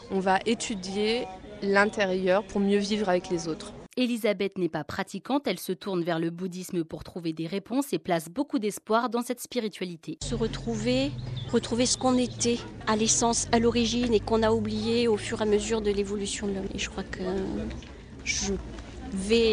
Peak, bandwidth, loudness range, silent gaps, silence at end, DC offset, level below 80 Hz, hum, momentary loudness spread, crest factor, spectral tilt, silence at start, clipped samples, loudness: -6 dBFS; 13.5 kHz; 6 LU; none; 0 s; under 0.1%; -46 dBFS; none; 11 LU; 20 dB; -4 dB/octave; 0 s; under 0.1%; -28 LUFS